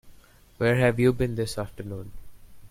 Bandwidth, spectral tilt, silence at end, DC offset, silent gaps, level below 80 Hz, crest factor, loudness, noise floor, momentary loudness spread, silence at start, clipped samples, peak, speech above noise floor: 16 kHz; -6.5 dB/octave; 0.05 s; under 0.1%; none; -46 dBFS; 20 dB; -25 LUFS; -53 dBFS; 17 LU; 0.05 s; under 0.1%; -8 dBFS; 28 dB